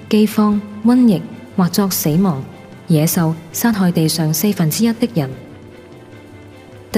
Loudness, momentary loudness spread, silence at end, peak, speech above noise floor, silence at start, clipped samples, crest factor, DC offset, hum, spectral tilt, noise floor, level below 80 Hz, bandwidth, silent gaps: -16 LUFS; 11 LU; 0 s; -2 dBFS; 23 dB; 0 s; under 0.1%; 16 dB; under 0.1%; none; -5.5 dB/octave; -38 dBFS; -52 dBFS; 16 kHz; none